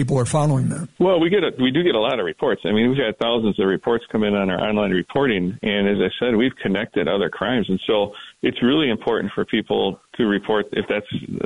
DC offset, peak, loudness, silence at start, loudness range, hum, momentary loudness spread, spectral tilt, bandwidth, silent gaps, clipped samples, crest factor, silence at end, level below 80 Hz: 0.2%; -8 dBFS; -20 LUFS; 0 s; 2 LU; none; 5 LU; -6 dB/octave; 11 kHz; none; under 0.1%; 12 dB; 0 s; -52 dBFS